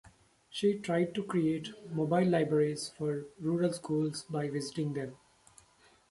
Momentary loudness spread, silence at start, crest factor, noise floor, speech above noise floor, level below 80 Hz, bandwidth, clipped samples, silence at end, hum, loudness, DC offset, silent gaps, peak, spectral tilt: 9 LU; 0.05 s; 18 dB; -64 dBFS; 33 dB; -70 dBFS; 11.5 kHz; under 0.1%; 0.95 s; none; -33 LUFS; under 0.1%; none; -16 dBFS; -6.5 dB/octave